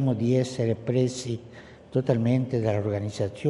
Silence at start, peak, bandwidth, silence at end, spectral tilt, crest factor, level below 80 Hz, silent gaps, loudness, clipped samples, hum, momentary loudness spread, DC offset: 0 s; -8 dBFS; 11.5 kHz; 0 s; -7.5 dB/octave; 18 dB; -60 dBFS; none; -26 LUFS; under 0.1%; none; 9 LU; under 0.1%